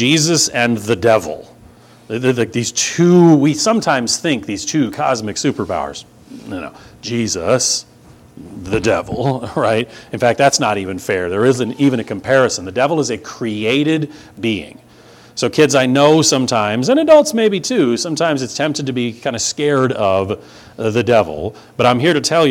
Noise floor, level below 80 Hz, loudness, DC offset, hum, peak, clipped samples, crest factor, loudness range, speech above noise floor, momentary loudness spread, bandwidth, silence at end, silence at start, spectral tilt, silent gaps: -43 dBFS; -50 dBFS; -15 LUFS; under 0.1%; none; 0 dBFS; under 0.1%; 16 dB; 6 LU; 28 dB; 13 LU; 17 kHz; 0 s; 0 s; -4 dB/octave; none